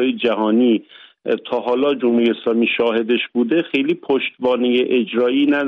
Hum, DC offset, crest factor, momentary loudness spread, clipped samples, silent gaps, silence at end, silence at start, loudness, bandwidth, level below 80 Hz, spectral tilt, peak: none; under 0.1%; 12 dB; 5 LU; under 0.1%; none; 0 s; 0 s; -18 LUFS; 5.2 kHz; -66 dBFS; -7 dB/octave; -6 dBFS